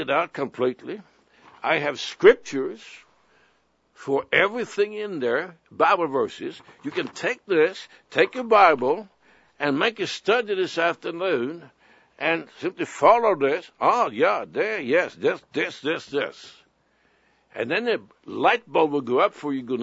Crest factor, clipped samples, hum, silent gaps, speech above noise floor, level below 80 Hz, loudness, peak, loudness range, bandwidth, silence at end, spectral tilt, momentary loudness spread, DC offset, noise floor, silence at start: 22 dB; under 0.1%; none; none; 42 dB; -68 dBFS; -23 LUFS; -2 dBFS; 5 LU; 8 kHz; 0 s; -4.5 dB/octave; 14 LU; under 0.1%; -65 dBFS; 0 s